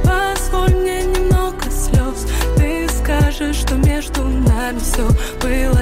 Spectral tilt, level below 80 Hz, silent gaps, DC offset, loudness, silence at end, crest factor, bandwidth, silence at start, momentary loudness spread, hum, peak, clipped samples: -5.5 dB/octave; -18 dBFS; none; under 0.1%; -17 LUFS; 0 s; 10 dB; 16 kHz; 0 s; 4 LU; none; -6 dBFS; under 0.1%